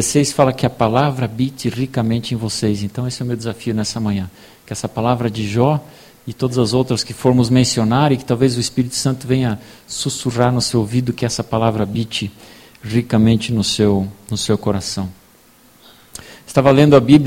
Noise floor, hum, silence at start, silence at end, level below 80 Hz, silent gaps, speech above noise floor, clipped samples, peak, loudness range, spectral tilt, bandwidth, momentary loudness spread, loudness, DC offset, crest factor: -49 dBFS; none; 0 s; 0 s; -46 dBFS; none; 33 dB; under 0.1%; 0 dBFS; 4 LU; -5.5 dB/octave; 16.5 kHz; 10 LU; -17 LUFS; under 0.1%; 16 dB